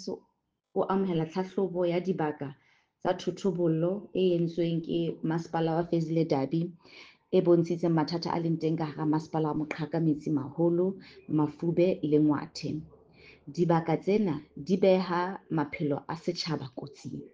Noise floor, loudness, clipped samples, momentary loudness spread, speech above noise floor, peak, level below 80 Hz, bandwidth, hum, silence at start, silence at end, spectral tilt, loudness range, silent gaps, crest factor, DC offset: -75 dBFS; -29 LUFS; under 0.1%; 11 LU; 46 dB; -12 dBFS; -66 dBFS; 7.6 kHz; none; 0 s; 0.05 s; -7.5 dB/octave; 2 LU; none; 18 dB; under 0.1%